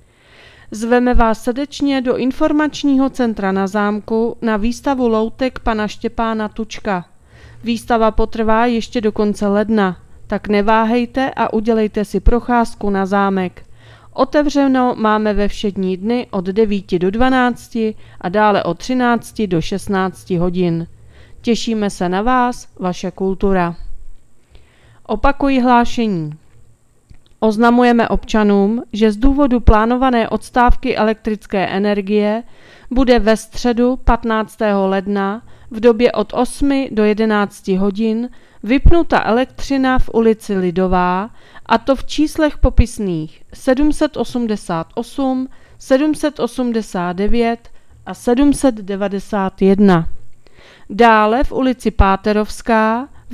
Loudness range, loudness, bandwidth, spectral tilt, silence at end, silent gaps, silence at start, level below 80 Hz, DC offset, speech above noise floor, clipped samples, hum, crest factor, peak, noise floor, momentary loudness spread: 4 LU; -16 LUFS; 14 kHz; -6.5 dB/octave; 0 s; none; 0.7 s; -28 dBFS; under 0.1%; 32 dB; under 0.1%; none; 16 dB; 0 dBFS; -46 dBFS; 9 LU